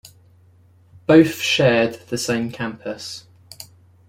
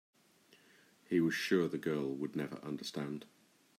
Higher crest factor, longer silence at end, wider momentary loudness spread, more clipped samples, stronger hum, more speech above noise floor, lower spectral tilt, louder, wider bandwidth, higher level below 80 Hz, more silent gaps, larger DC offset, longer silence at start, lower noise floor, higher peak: about the same, 20 dB vs 20 dB; about the same, 0.45 s vs 0.55 s; first, 25 LU vs 10 LU; neither; neither; about the same, 34 dB vs 31 dB; about the same, -5 dB/octave vs -5.5 dB/octave; first, -19 LUFS vs -37 LUFS; about the same, 16.5 kHz vs 16 kHz; first, -56 dBFS vs -80 dBFS; neither; neither; about the same, 1.1 s vs 1.1 s; second, -52 dBFS vs -67 dBFS; first, -2 dBFS vs -18 dBFS